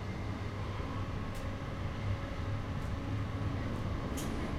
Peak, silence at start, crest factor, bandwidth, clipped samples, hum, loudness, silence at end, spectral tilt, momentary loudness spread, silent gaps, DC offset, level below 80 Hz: -24 dBFS; 0 s; 12 dB; 15 kHz; under 0.1%; none; -38 LUFS; 0 s; -6.5 dB/octave; 3 LU; none; under 0.1%; -44 dBFS